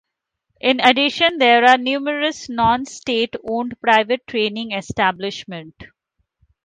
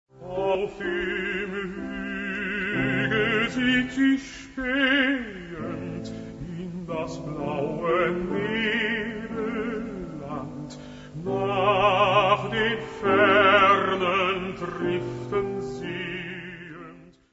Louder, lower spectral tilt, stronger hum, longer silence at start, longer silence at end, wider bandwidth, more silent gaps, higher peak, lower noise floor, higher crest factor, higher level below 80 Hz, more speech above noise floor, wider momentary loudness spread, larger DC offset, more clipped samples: first, -17 LUFS vs -25 LUFS; second, -3.5 dB/octave vs -5.5 dB/octave; neither; first, 0.65 s vs 0.15 s; first, 0.8 s vs 0.25 s; first, 9.6 kHz vs 8 kHz; neither; first, 0 dBFS vs -4 dBFS; first, -75 dBFS vs -47 dBFS; about the same, 18 dB vs 20 dB; about the same, -52 dBFS vs -52 dBFS; first, 57 dB vs 22 dB; second, 13 LU vs 16 LU; neither; neither